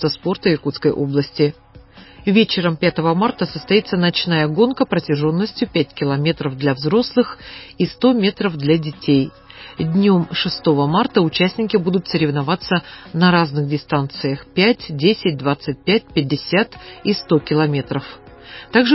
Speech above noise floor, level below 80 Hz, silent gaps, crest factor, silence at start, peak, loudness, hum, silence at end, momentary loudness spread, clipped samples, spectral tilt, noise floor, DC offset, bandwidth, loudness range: 25 dB; -50 dBFS; none; 16 dB; 0 s; -2 dBFS; -18 LUFS; none; 0 s; 8 LU; under 0.1%; -10 dB/octave; -43 dBFS; under 0.1%; 5.8 kHz; 2 LU